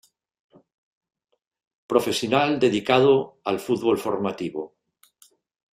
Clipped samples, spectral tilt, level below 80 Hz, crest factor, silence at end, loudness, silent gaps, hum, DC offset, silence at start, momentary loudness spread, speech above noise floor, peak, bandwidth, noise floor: under 0.1%; -5 dB/octave; -64 dBFS; 20 dB; 1.05 s; -22 LUFS; none; none; under 0.1%; 1.9 s; 13 LU; 38 dB; -4 dBFS; 16 kHz; -59 dBFS